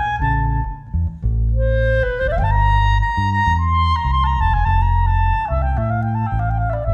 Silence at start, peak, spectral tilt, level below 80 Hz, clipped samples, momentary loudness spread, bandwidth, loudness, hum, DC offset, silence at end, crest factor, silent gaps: 0 s; -6 dBFS; -7.5 dB/octave; -20 dBFS; under 0.1%; 5 LU; 7 kHz; -18 LUFS; none; under 0.1%; 0 s; 12 dB; none